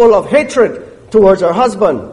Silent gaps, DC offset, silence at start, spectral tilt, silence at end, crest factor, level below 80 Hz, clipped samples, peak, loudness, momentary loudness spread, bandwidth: none; under 0.1%; 0 s; -6 dB/octave; 0 s; 10 dB; -40 dBFS; under 0.1%; 0 dBFS; -11 LUFS; 6 LU; 11.5 kHz